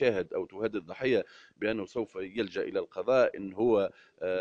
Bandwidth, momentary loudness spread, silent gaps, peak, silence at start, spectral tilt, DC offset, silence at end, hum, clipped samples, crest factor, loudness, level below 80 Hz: 7.6 kHz; 10 LU; none; -14 dBFS; 0 s; -6.5 dB/octave; under 0.1%; 0 s; none; under 0.1%; 16 dB; -31 LUFS; -66 dBFS